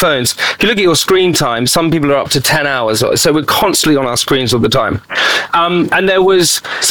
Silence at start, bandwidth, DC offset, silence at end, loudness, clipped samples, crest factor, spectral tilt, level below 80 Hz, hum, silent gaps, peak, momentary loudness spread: 0 s; 19.5 kHz; 1%; 0 s; -11 LUFS; under 0.1%; 10 dB; -3.5 dB/octave; -42 dBFS; none; none; -2 dBFS; 3 LU